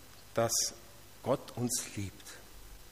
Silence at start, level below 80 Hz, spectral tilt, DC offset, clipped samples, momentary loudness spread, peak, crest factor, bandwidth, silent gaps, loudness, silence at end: 0 s; -60 dBFS; -3 dB/octave; 0.1%; under 0.1%; 23 LU; -16 dBFS; 20 dB; 15.5 kHz; none; -34 LUFS; 0 s